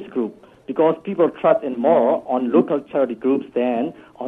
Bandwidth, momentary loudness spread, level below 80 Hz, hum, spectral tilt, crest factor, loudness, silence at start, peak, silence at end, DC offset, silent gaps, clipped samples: 3.9 kHz; 9 LU; -66 dBFS; none; -9 dB/octave; 18 dB; -20 LUFS; 0 s; -2 dBFS; 0 s; under 0.1%; none; under 0.1%